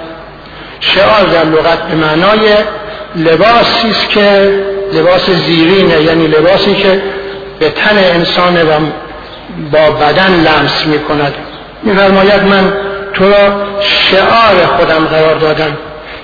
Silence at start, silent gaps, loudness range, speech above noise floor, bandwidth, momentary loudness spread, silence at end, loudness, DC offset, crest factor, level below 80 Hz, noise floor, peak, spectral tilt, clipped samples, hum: 0 s; none; 2 LU; 20 dB; 5.4 kHz; 15 LU; 0 s; -8 LUFS; under 0.1%; 8 dB; -34 dBFS; -28 dBFS; 0 dBFS; -6.5 dB/octave; 0.4%; none